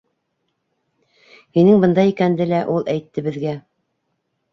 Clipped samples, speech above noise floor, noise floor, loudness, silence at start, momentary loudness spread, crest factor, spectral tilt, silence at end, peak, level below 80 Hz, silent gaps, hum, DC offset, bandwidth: under 0.1%; 56 dB; -72 dBFS; -17 LUFS; 1.55 s; 13 LU; 16 dB; -9 dB/octave; 0.95 s; -2 dBFS; -60 dBFS; none; none; under 0.1%; 6.4 kHz